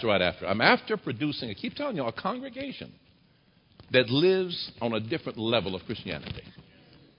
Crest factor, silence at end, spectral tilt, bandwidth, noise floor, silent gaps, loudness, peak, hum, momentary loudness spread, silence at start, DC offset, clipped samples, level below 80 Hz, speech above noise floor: 24 dB; 0.55 s; -9.5 dB/octave; 5.4 kHz; -63 dBFS; none; -28 LUFS; -4 dBFS; none; 15 LU; 0 s; under 0.1%; under 0.1%; -58 dBFS; 35 dB